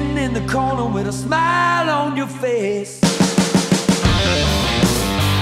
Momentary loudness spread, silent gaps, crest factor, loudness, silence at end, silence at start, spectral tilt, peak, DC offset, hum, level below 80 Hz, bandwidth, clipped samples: 6 LU; none; 14 dB; -17 LUFS; 0 s; 0 s; -4.5 dB/octave; -4 dBFS; under 0.1%; none; -32 dBFS; 16 kHz; under 0.1%